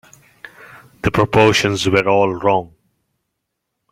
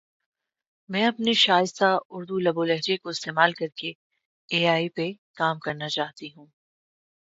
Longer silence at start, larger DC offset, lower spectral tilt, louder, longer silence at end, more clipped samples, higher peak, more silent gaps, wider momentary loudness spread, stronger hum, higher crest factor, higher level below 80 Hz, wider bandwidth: second, 0.75 s vs 0.9 s; neither; about the same, -5 dB/octave vs -4 dB/octave; first, -15 LUFS vs -24 LUFS; first, 1.25 s vs 0.95 s; neither; first, 0 dBFS vs -4 dBFS; second, none vs 2.05-2.10 s, 3.95-4.10 s, 4.25-4.48 s, 5.18-5.34 s; second, 8 LU vs 12 LU; neither; about the same, 18 dB vs 22 dB; first, -44 dBFS vs -74 dBFS; first, 15.5 kHz vs 8 kHz